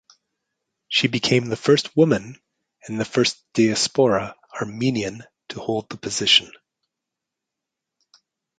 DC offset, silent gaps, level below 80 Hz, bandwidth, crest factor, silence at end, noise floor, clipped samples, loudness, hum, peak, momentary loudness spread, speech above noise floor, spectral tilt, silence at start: under 0.1%; none; -60 dBFS; 9.4 kHz; 22 dB; 2.15 s; -84 dBFS; under 0.1%; -20 LUFS; none; -2 dBFS; 15 LU; 63 dB; -4 dB/octave; 0.9 s